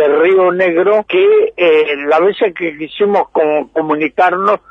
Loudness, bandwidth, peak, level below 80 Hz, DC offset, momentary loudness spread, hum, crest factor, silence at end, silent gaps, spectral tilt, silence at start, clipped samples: -12 LUFS; 5.8 kHz; -2 dBFS; -56 dBFS; under 0.1%; 6 LU; none; 10 dB; 0.15 s; none; -7 dB/octave; 0 s; under 0.1%